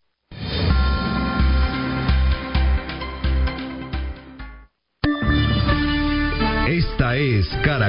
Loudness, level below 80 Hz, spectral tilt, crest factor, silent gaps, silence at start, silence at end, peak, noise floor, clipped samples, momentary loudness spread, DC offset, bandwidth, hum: -21 LUFS; -24 dBFS; -11 dB/octave; 16 dB; none; 0.3 s; 0 s; -4 dBFS; -47 dBFS; under 0.1%; 11 LU; under 0.1%; 5.4 kHz; none